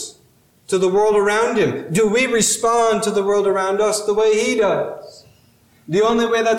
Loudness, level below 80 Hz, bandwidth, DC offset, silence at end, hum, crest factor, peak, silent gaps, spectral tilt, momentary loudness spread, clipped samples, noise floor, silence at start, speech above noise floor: -17 LUFS; -54 dBFS; 16 kHz; under 0.1%; 0 s; none; 12 dB; -6 dBFS; none; -3.5 dB/octave; 7 LU; under 0.1%; -55 dBFS; 0 s; 38 dB